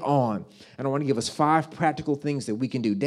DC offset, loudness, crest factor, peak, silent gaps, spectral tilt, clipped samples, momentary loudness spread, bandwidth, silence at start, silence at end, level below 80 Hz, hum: under 0.1%; -26 LUFS; 18 dB; -8 dBFS; none; -6 dB/octave; under 0.1%; 8 LU; 13 kHz; 0 s; 0 s; -66 dBFS; none